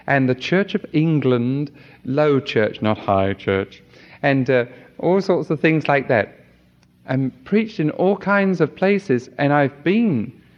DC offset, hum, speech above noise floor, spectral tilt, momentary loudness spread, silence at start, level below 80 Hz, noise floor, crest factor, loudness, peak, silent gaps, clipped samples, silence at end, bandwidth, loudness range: under 0.1%; none; 36 dB; -8 dB/octave; 7 LU; 0.05 s; -60 dBFS; -54 dBFS; 18 dB; -19 LUFS; -2 dBFS; none; under 0.1%; 0.25 s; 7.2 kHz; 2 LU